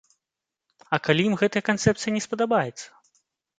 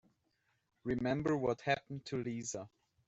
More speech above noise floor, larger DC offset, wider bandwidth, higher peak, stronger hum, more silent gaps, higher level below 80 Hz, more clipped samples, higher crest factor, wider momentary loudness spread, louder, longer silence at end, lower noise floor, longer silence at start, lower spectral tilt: first, 64 dB vs 43 dB; neither; first, 9.4 kHz vs 8.2 kHz; first, -4 dBFS vs -20 dBFS; neither; neither; first, -58 dBFS vs -66 dBFS; neither; about the same, 22 dB vs 20 dB; about the same, 10 LU vs 12 LU; first, -24 LUFS vs -38 LUFS; first, 0.75 s vs 0.4 s; first, -87 dBFS vs -80 dBFS; about the same, 0.9 s vs 0.85 s; about the same, -5 dB/octave vs -5.5 dB/octave